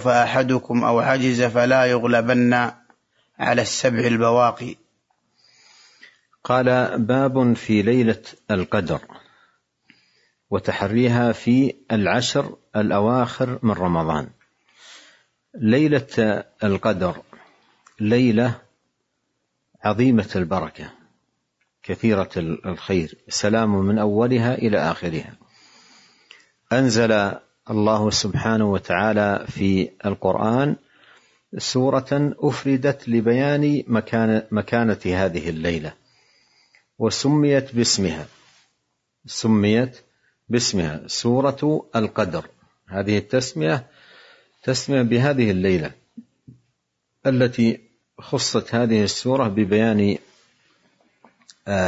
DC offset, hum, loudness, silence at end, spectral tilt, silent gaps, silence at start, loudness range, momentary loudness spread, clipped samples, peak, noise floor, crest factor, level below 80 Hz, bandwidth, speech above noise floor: under 0.1%; none; -20 LUFS; 0 s; -5.5 dB/octave; none; 0 s; 4 LU; 10 LU; under 0.1%; -4 dBFS; -75 dBFS; 18 dB; -56 dBFS; 8 kHz; 55 dB